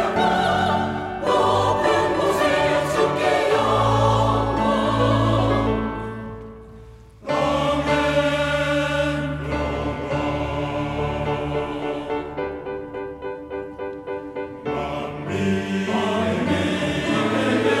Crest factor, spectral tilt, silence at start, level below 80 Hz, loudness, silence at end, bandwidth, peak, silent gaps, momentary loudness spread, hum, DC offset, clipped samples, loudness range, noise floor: 16 dB; -6 dB/octave; 0 s; -40 dBFS; -22 LUFS; 0 s; 15.5 kHz; -6 dBFS; none; 12 LU; none; under 0.1%; under 0.1%; 9 LU; -43 dBFS